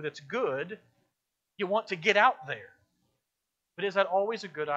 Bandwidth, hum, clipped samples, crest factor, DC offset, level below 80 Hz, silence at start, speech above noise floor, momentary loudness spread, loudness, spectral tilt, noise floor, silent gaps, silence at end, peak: 8 kHz; none; under 0.1%; 24 dB; under 0.1%; -82 dBFS; 0 s; 56 dB; 16 LU; -29 LUFS; -4 dB/octave; -85 dBFS; none; 0 s; -8 dBFS